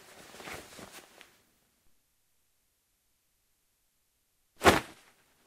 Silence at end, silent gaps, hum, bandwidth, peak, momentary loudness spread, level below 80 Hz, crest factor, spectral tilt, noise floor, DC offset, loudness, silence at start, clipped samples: 0.65 s; none; none; 16 kHz; -6 dBFS; 25 LU; -58 dBFS; 32 dB; -3.5 dB/octave; -75 dBFS; under 0.1%; -26 LUFS; 0.45 s; under 0.1%